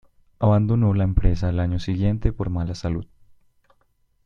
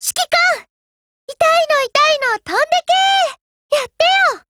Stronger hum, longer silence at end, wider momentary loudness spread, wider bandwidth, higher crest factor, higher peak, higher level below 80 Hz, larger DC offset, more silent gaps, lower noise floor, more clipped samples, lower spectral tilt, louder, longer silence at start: neither; first, 1.2 s vs 0.1 s; about the same, 8 LU vs 7 LU; second, 7.2 kHz vs 19.5 kHz; about the same, 18 dB vs 14 dB; about the same, -4 dBFS vs -2 dBFS; first, -30 dBFS vs -60 dBFS; neither; second, none vs 0.70-1.28 s, 3.41-3.69 s; second, -64 dBFS vs under -90 dBFS; neither; first, -9 dB/octave vs 0.5 dB/octave; second, -23 LUFS vs -14 LUFS; first, 0.4 s vs 0 s